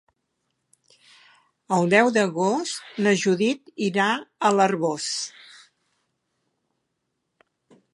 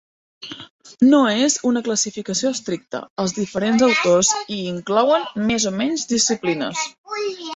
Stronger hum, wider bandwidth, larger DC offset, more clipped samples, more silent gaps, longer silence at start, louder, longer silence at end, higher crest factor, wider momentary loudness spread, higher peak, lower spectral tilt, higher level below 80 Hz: neither; first, 11.5 kHz vs 8.4 kHz; neither; neither; second, none vs 0.70-0.79 s, 3.10-3.16 s, 6.98-7.04 s; first, 1.7 s vs 0.4 s; second, -22 LUFS vs -19 LUFS; first, 2.65 s vs 0 s; first, 22 dB vs 16 dB; second, 9 LU vs 12 LU; about the same, -4 dBFS vs -4 dBFS; first, -4.5 dB/octave vs -3 dB/octave; second, -76 dBFS vs -58 dBFS